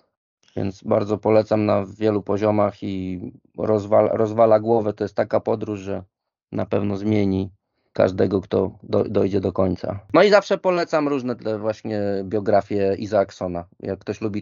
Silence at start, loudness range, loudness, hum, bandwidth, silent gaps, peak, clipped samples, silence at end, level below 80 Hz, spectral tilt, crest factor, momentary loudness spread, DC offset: 0.55 s; 4 LU; -21 LUFS; none; 7.4 kHz; none; -2 dBFS; under 0.1%; 0 s; -58 dBFS; -6 dB/octave; 20 dB; 12 LU; under 0.1%